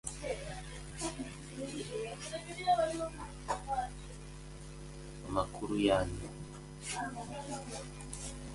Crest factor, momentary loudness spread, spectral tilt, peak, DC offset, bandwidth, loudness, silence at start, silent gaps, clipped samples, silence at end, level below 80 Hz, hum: 22 dB; 17 LU; -4.5 dB/octave; -16 dBFS; under 0.1%; 11.5 kHz; -38 LUFS; 0.05 s; none; under 0.1%; 0 s; -50 dBFS; none